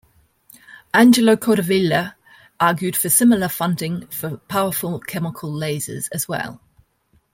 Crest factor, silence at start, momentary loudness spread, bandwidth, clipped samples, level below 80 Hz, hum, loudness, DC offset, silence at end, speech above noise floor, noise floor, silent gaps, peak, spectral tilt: 18 dB; 0.7 s; 13 LU; 17 kHz; under 0.1%; -58 dBFS; none; -19 LUFS; under 0.1%; 0.8 s; 43 dB; -62 dBFS; none; -2 dBFS; -4.5 dB/octave